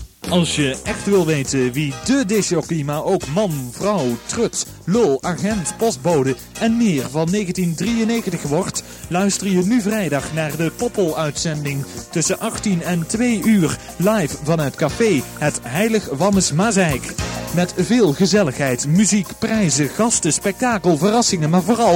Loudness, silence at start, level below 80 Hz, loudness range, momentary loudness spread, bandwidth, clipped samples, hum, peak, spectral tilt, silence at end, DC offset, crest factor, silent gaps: -18 LUFS; 0 s; -44 dBFS; 3 LU; 6 LU; 17 kHz; under 0.1%; none; -2 dBFS; -4.5 dB/octave; 0 s; under 0.1%; 16 dB; none